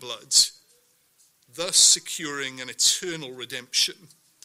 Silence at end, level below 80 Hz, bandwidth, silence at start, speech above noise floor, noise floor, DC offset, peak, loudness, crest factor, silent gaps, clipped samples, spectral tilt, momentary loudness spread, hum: 0.5 s; -70 dBFS; 16 kHz; 0 s; 38 dB; -63 dBFS; under 0.1%; -2 dBFS; -20 LUFS; 22 dB; none; under 0.1%; 1 dB/octave; 17 LU; none